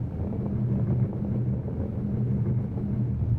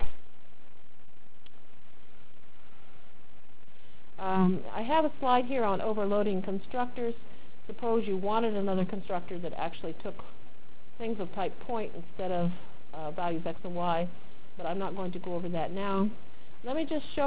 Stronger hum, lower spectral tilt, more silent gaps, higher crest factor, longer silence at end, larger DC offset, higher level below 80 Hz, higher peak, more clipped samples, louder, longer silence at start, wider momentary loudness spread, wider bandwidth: neither; first, -12.5 dB/octave vs -10 dB/octave; neither; second, 12 dB vs 20 dB; about the same, 0 s vs 0 s; second, under 0.1% vs 4%; first, -42 dBFS vs -54 dBFS; about the same, -14 dBFS vs -12 dBFS; neither; first, -28 LUFS vs -32 LUFS; about the same, 0 s vs 0 s; second, 4 LU vs 14 LU; second, 2.7 kHz vs 4 kHz